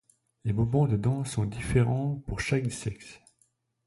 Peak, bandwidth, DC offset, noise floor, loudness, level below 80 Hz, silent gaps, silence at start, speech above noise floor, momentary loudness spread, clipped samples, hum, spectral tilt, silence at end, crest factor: -12 dBFS; 11.5 kHz; under 0.1%; -71 dBFS; -29 LUFS; -46 dBFS; none; 0.45 s; 44 dB; 12 LU; under 0.1%; none; -6.5 dB/octave; 0.7 s; 18 dB